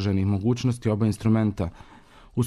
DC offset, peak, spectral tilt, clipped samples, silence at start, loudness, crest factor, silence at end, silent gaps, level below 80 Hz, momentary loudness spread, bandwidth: under 0.1%; -12 dBFS; -7.5 dB/octave; under 0.1%; 0 s; -25 LUFS; 12 dB; 0 s; none; -48 dBFS; 10 LU; 12 kHz